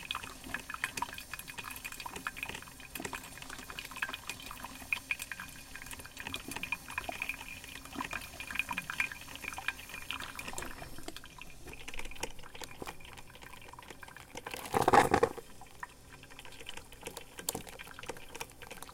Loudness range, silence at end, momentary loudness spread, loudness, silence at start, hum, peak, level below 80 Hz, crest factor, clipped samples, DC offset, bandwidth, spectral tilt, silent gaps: 11 LU; 0 s; 14 LU; -38 LUFS; 0 s; none; -10 dBFS; -56 dBFS; 30 dB; under 0.1%; under 0.1%; 17 kHz; -3 dB/octave; none